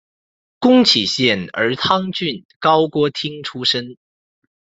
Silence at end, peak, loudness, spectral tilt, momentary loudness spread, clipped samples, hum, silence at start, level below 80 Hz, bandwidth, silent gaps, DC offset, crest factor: 0.7 s; 0 dBFS; -16 LUFS; -4.5 dB/octave; 12 LU; under 0.1%; none; 0.6 s; -60 dBFS; 8 kHz; 2.45-2.49 s, 2.56-2.60 s; under 0.1%; 18 dB